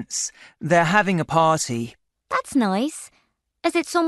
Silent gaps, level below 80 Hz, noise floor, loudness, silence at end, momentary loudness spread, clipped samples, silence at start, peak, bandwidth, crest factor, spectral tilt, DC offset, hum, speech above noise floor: none; -60 dBFS; -66 dBFS; -21 LUFS; 0 s; 12 LU; under 0.1%; 0 s; -2 dBFS; 12 kHz; 20 dB; -4.5 dB/octave; under 0.1%; none; 45 dB